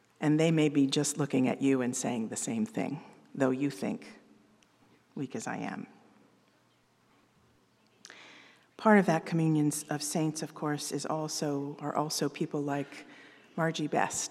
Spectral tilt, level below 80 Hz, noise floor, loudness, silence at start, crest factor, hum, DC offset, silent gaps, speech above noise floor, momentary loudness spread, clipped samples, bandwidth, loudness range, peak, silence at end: -5 dB/octave; -82 dBFS; -68 dBFS; -31 LUFS; 0.2 s; 24 dB; none; under 0.1%; none; 38 dB; 18 LU; under 0.1%; 14.5 kHz; 14 LU; -8 dBFS; 0 s